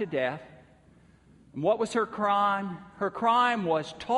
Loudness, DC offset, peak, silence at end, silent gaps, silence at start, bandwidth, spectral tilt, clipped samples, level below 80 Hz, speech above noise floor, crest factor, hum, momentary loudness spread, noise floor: -27 LUFS; under 0.1%; -12 dBFS; 0 s; none; 0 s; 11.5 kHz; -5 dB/octave; under 0.1%; -66 dBFS; 31 dB; 16 dB; none; 10 LU; -58 dBFS